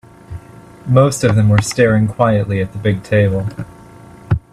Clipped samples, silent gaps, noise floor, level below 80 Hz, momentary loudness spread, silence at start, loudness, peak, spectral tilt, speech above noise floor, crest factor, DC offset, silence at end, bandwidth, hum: under 0.1%; none; -38 dBFS; -40 dBFS; 21 LU; 0.3 s; -15 LUFS; 0 dBFS; -6.5 dB/octave; 25 dB; 16 dB; under 0.1%; 0.15 s; 13 kHz; none